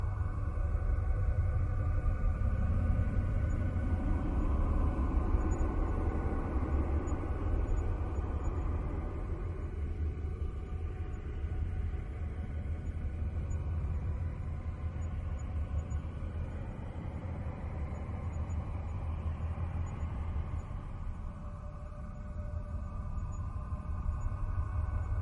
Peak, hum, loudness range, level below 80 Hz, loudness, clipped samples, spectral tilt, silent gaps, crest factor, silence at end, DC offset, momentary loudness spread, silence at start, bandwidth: -18 dBFS; none; 7 LU; -36 dBFS; -37 LUFS; under 0.1%; -9 dB/octave; none; 16 dB; 0 s; under 0.1%; 8 LU; 0 s; 7.4 kHz